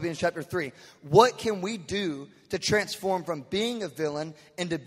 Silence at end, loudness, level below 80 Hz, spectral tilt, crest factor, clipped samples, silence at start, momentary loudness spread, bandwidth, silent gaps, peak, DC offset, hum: 0 s; -28 LUFS; -60 dBFS; -4.5 dB/octave; 24 dB; under 0.1%; 0 s; 15 LU; 16 kHz; none; -4 dBFS; under 0.1%; none